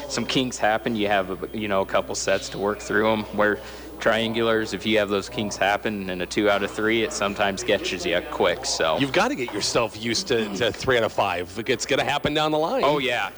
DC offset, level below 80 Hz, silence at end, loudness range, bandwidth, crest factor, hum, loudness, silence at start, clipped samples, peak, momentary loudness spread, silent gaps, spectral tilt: under 0.1%; -48 dBFS; 0 s; 1 LU; over 20 kHz; 14 dB; none; -23 LUFS; 0 s; under 0.1%; -10 dBFS; 4 LU; none; -3.5 dB/octave